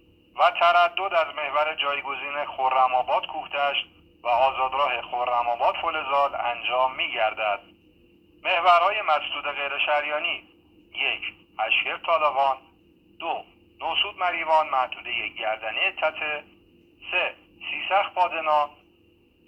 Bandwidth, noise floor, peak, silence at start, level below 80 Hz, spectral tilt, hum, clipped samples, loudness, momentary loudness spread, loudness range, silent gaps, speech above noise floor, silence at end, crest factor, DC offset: 8.2 kHz; -60 dBFS; -6 dBFS; 0.35 s; -64 dBFS; -3 dB/octave; none; under 0.1%; -24 LUFS; 11 LU; 3 LU; none; 36 dB; 0.75 s; 20 dB; under 0.1%